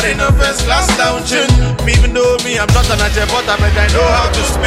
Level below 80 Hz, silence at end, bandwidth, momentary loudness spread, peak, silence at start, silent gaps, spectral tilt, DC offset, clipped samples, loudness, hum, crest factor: -16 dBFS; 0 s; 15.5 kHz; 2 LU; 0 dBFS; 0 s; none; -4 dB/octave; under 0.1%; under 0.1%; -12 LUFS; none; 12 dB